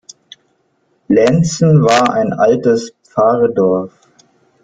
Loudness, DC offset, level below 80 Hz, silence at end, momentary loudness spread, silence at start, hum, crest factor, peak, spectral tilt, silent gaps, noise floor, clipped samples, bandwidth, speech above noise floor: -13 LUFS; under 0.1%; -50 dBFS; 0.75 s; 8 LU; 1.1 s; none; 12 dB; 0 dBFS; -6.5 dB/octave; none; -61 dBFS; under 0.1%; 9.2 kHz; 49 dB